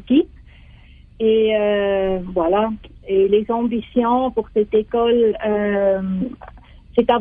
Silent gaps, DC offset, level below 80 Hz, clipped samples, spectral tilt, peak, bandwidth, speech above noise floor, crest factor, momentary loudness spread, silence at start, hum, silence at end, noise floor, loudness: none; under 0.1%; -44 dBFS; under 0.1%; -9.5 dB/octave; -4 dBFS; 3.8 kHz; 27 dB; 14 dB; 8 LU; 0.05 s; none; 0 s; -44 dBFS; -19 LUFS